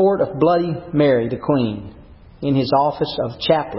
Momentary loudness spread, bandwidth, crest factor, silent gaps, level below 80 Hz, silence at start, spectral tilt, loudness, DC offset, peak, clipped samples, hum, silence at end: 8 LU; 5.8 kHz; 16 dB; none; -46 dBFS; 0 s; -11.5 dB/octave; -19 LUFS; under 0.1%; -2 dBFS; under 0.1%; none; 0 s